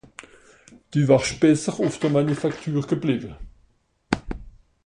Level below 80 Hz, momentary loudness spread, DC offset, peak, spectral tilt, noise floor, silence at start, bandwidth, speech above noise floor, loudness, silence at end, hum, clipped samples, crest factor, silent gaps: -46 dBFS; 20 LU; under 0.1%; -2 dBFS; -6 dB/octave; -63 dBFS; 0.9 s; 11 kHz; 41 dB; -22 LUFS; 0.35 s; none; under 0.1%; 20 dB; none